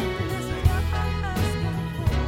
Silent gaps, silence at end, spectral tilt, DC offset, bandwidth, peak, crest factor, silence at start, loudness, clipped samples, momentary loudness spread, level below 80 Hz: none; 0 s; -6 dB/octave; under 0.1%; 16.5 kHz; -6 dBFS; 18 dB; 0 s; -26 LUFS; under 0.1%; 4 LU; -30 dBFS